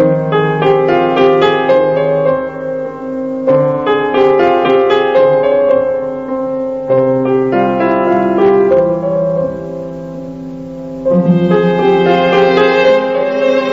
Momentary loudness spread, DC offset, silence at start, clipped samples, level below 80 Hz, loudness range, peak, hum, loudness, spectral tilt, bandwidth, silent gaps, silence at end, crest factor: 11 LU; 0.2%; 0 s; under 0.1%; -46 dBFS; 3 LU; -2 dBFS; none; -12 LUFS; -8 dB/octave; 7.2 kHz; none; 0 s; 10 dB